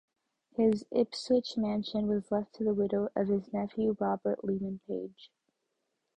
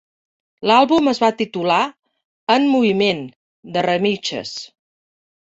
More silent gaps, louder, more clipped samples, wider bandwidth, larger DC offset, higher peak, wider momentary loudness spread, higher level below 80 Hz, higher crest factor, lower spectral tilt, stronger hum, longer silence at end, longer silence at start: second, none vs 2.25-2.47 s, 3.36-3.63 s; second, -32 LUFS vs -18 LUFS; neither; first, 9.6 kHz vs 8 kHz; neither; second, -16 dBFS vs -2 dBFS; second, 8 LU vs 15 LU; about the same, -66 dBFS vs -62 dBFS; about the same, 16 dB vs 18 dB; first, -7 dB/octave vs -5 dB/octave; neither; about the same, 0.9 s vs 0.9 s; about the same, 0.6 s vs 0.6 s